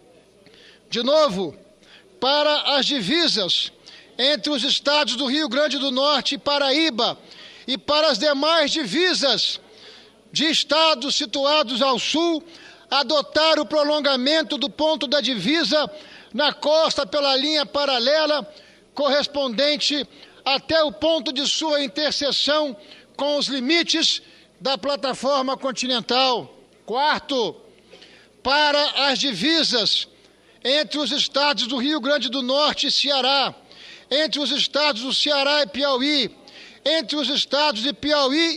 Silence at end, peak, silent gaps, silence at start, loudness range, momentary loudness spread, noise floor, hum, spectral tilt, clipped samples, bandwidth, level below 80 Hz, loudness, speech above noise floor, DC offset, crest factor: 0 s; -4 dBFS; none; 0.9 s; 2 LU; 7 LU; -53 dBFS; none; -2.5 dB/octave; under 0.1%; 11.5 kHz; -62 dBFS; -20 LUFS; 32 dB; under 0.1%; 18 dB